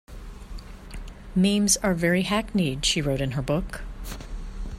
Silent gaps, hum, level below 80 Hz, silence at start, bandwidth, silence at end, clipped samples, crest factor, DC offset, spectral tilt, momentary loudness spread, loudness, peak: none; none; -38 dBFS; 0.1 s; 16 kHz; 0 s; under 0.1%; 18 dB; under 0.1%; -4 dB/octave; 21 LU; -24 LUFS; -8 dBFS